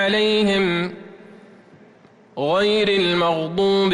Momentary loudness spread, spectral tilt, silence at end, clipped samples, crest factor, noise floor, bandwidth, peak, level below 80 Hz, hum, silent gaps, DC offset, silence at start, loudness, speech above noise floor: 11 LU; -5.5 dB/octave; 0 s; under 0.1%; 12 dB; -50 dBFS; 11 kHz; -10 dBFS; -56 dBFS; none; none; under 0.1%; 0 s; -19 LUFS; 32 dB